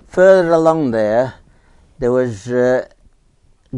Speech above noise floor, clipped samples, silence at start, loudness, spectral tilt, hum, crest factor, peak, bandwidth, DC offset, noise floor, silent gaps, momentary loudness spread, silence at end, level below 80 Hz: 40 dB; under 0.1%; 0.15 s; -15 LUFS; -7 dB/octave; none; 16 dB; 0 dBFS; 10.5 kHz; under 0.1%; -53 dBFS; none; 11 LU; 0 s; -46 dBFS